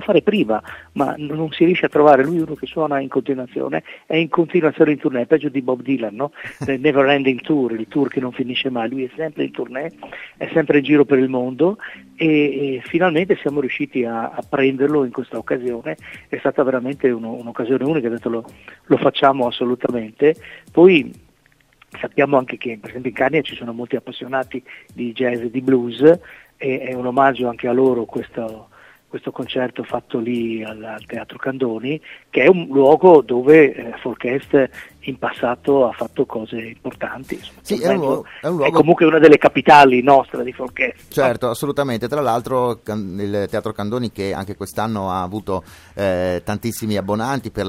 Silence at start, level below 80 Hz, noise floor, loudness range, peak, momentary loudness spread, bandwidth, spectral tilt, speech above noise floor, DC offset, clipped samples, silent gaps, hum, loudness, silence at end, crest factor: 0 s; -54 dBFS; -56 dBFS; 9 LU; 0 dBFS; 15 LU; 16 kHz; -6.5 dB/octave; 39 dB; under 0.1%; under 0.1%; none; none; -18 LUFS; 0 s; 18 dB